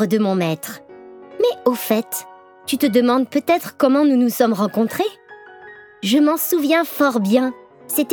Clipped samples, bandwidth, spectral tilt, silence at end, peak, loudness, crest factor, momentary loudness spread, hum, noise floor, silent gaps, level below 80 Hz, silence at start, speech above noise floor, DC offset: under 0.1%; over 20 kHz; -5 dB/octave; 0 s; -2 dBFS; -18 LUFS; 16 dB; 11 LU; none; -41 dBFS; none; -74 dBFS; 0 s; 24 dB; under 0.1%